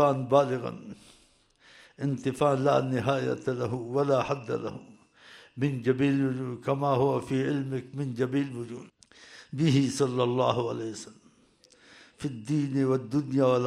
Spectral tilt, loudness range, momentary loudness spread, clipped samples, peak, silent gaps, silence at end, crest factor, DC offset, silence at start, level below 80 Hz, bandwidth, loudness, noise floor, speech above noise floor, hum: -7 dB/octave; 2 LU; 14 LU; under 0.1%; -8 dBFS; none; 0 s; 20 dB; under 0.1%; 0 s; -66 dBFS; 12 kHz; -28 LUFS; -62 dBFS; 35 dB; none